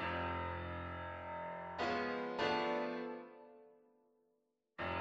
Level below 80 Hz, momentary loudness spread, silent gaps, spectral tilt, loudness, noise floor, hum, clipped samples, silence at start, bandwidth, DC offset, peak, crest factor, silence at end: -64 dBFS; 16 LU; none; -6 dB/octave; -41 LUFS; -82 dBFS; none; under 0.1%; 0 s; 8 kHz; under 0.1%; -22 dBFS; 20 dB; 0 s